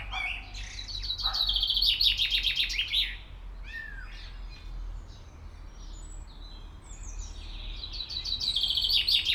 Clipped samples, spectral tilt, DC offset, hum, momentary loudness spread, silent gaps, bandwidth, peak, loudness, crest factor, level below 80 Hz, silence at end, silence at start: under 0.1%; -1 dB/octave; under 0.1%; none; 24 LU; none; 19 kHz; -10 dBFS; -26 LUFS; 22 dB; -42 dBFS; 0 s; 0 s